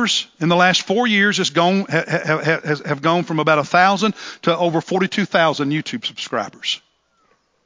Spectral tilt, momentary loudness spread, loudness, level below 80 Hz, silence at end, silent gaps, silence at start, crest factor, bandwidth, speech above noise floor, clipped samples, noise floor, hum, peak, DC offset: -4.5 dB/octave; 9 LU; -18 LUFS; -68 dBFS; 0.9 s; none; 0 s; 18 dB; 7.6 kHz; 44 dB; under 0.1%; -62 dBFS; none; 0 dBFS; under 0.1%